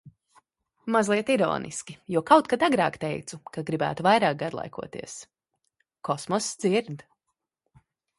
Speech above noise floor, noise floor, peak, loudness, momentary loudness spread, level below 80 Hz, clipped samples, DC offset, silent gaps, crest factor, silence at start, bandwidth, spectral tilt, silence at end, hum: 56 dB; -82 dBFS; -4 dBFS; -25 LUFS; 18 LU; -66 dBFS; under 0.1%; under 0.1%; none; 24 dB; 0.05 s; 11.5 kHz; -4.5 dB/octave; 1.2 s; none